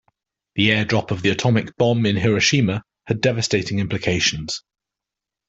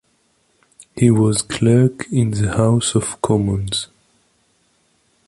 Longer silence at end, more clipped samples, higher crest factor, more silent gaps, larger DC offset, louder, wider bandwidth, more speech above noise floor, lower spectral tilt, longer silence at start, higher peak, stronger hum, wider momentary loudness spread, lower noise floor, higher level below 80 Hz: second, 0.9 s vs 1.45 s; neither; about the same, 18 dB vs 16 dB; neither; neither; second, -20 LUFS vs -17 LUFS; second, 8.2 kHz vs 11.5 kHz; first, 67 dB vs 46 dB; about the same, -4.5 dB/octave vs -5.5 dB/octave; second, 0.55 s vs 0.95 s; about the same, -2 dBFS vs -2 dBFS; neither; about the same, 11 LU vs 9 LU; first, -86 dBFS vs -62 dBFS; second, -50 dBFS vs -42 dBFS